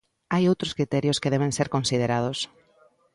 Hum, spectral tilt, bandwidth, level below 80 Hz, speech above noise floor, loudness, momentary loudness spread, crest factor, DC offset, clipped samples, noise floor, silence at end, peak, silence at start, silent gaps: none; -5 dB/octave; 11.5 kHz; -56 dBFS; 36 dB; -25 LUFS; 6 LU; 16 dB; under 0.1%; under 0.1%; -61 dBFS; 0.7 s; -10 dBFS; 0.3 s; none